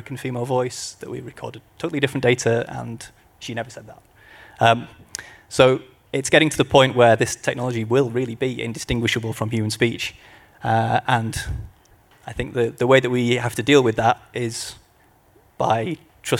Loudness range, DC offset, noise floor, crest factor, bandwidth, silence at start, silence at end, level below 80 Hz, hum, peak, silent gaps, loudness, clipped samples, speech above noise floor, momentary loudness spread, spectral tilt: 7 LU; under 0.1%; -56 dBFS; 20 dB; 16.5 kHz; 0.05 s; 0 s; -46 dBFS; none; 0 dBFS; none; -21 LUFS; under 0.1%; 35 dB; 18 LU; -5 dB/octave